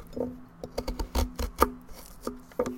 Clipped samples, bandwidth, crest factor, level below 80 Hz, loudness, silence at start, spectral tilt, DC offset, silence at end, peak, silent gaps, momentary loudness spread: under 0.1%; 17 kHz; 30 dB; -38 dBFS; -33 LUFS; 0 s; -5 dB/octave; under 0.1%; 0 s; -4 dBFS; none; 15 LU